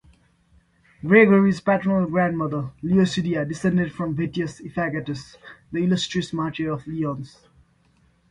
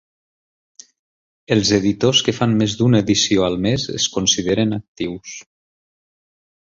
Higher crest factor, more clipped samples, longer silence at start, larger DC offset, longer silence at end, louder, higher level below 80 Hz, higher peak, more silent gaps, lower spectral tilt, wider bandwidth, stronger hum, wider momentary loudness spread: about the same, 20 dB vs 18 dB; neither; second, 1.05 s vs 1.5 s; neither; second, 1.05 s vs 1.25 s; second, -22 LUFS vs -17 LUFS; second, -54 dBFS vs -48 dBFS; about the same, -2 dBFS vs -2 dBFS; second, none vs 4.88-4.95 s; first, -6.5 dB/octave vs -4 dB/octave; first, 10 kHz vs 7.8 kHz; neither; about the same, 14 LU vs 12 LU